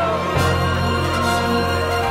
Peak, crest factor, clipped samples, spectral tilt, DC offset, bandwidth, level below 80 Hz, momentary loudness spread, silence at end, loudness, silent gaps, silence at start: -6 dBFS; 14 dB; under 0.1%; -5.5 dB/octave; under 0.1%; 16 kHz; -34 dBFS; 1 LU; 0 s; -19 LUFS; none; 0 s